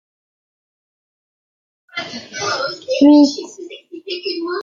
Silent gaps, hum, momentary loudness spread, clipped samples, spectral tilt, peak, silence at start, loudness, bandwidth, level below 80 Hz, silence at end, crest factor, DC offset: none; none; 23 LU; under 0.1%; -3.5 dB/octave; -2 dBFS; 1.95 s; -16 LUFS; 7.4 kHz; -66 dBFS; 0 s; 18 dB; under 0.1%